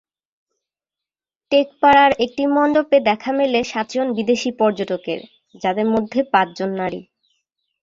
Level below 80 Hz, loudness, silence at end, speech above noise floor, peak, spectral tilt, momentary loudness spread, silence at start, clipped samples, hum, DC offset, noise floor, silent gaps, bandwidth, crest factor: -58 dBFS; -18 LUFS; 0.8 s; 71 dB; -2 dBFS; -5 dB/octave; 12 LU; 1.5 s; under 0.1%; none; under 0.1%; -89 dBFS; none; 7.8 kHz; 18 dB